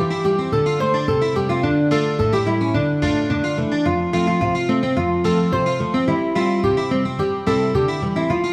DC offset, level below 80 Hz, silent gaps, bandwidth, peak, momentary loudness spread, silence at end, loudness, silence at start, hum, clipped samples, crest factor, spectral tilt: under 0.1%; -40 dBFS; none; 10.5 kHz; -6 dBFS; 2 LU; 0 s; -19 LUFS; 0 s; none; under 0.1%; 14 dB; -7 dB/octave